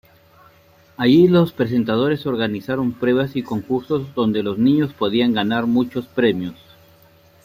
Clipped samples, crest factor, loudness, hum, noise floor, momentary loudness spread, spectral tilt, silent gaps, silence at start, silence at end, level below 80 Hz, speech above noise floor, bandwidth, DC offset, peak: under 0.1%; 16 dB; -19 LUFS; none; -52 dBFS; 9 LU; -8 dB/octave; none; 1 s; 0.9 s; -56 dBFS; 34 dB; 15.5 kHz; under 0.1%; -4 dBFS